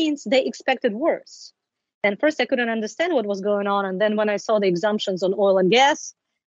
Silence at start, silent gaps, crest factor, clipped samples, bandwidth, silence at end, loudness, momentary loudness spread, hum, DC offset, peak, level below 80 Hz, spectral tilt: 0 s; 1.94-2.01 s; 18 dB; under 0.1%; 8 kHz; 0.5 s; -21 LUFS; 7 LU; none; under 0.1%; -4 dBFS; -76 dBFS; -4.5 dB/octave